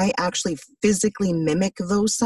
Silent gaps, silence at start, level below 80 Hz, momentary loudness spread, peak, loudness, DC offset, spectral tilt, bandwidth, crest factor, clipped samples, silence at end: none; 0 s; -52 dBFS; 4 LU; -8 dBFS; -22 LUFS; under 0.1%; -4.5 dB/octave; 12.5 kHz; 14 dB; under 0.1%; 0 s